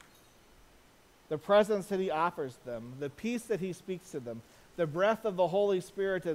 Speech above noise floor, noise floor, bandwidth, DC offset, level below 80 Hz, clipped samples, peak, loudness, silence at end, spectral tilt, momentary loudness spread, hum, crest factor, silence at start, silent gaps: 30 dB; -61 dBFS; 16 kHz; under 0.1%; -66 dBFS; under 0.1%; -14 dBFS; -32 LUFS; 0 s; -6 dB/octave; 15 LU; none; 18 dB; 1.3 s; none